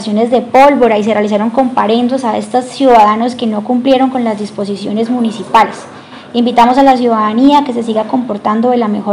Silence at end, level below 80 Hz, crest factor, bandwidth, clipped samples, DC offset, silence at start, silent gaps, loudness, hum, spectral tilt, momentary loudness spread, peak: 0 s; -48 dBFS; 10 dB; 11.5 kHz; 2%; under 0.1%; 0 s; none; -11 LUFS; none; -6 dB/octave; 9 LU; 0 dBFS